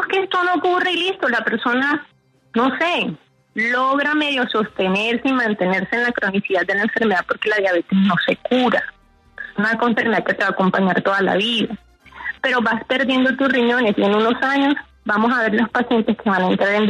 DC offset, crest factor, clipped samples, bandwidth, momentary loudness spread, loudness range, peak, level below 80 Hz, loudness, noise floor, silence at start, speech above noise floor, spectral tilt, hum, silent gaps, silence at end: under 0.1%; 14 dB; under 0.1%; 10.5 kHz; 5 LU; 2 LU; -4 dBFS; -58 dBFS; -18 LUFS; -39 dBFS; 0 s; 21 dB; -6 dB/octave; none; none; 0 s